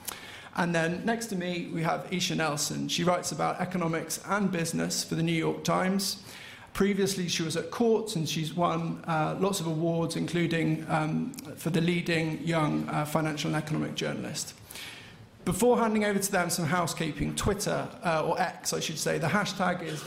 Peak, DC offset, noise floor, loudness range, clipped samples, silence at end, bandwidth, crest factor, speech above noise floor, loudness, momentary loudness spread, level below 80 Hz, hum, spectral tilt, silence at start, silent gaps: -12 dBFS; under 0.1%; -49 dBFS; 1 LU; under 0.1%; 0 s; 16 kHz; 16 dB; 20 dB; -29 LUFS; 7 LU; -56 dBFS; none; -4.5 dB/octave; 0 s; none